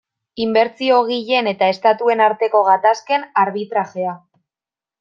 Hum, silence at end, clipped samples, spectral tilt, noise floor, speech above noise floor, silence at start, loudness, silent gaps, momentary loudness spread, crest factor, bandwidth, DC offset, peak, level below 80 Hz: none; 0.85 s; under 0.1%; -5 dB/octave; under -90 dBFS; over 74 dB; 0.35 s; -17 LUFS; none; 10 LU; 16 dB; 7.2 kHz; under 0.1%; -2 dBFS; -68 dBFS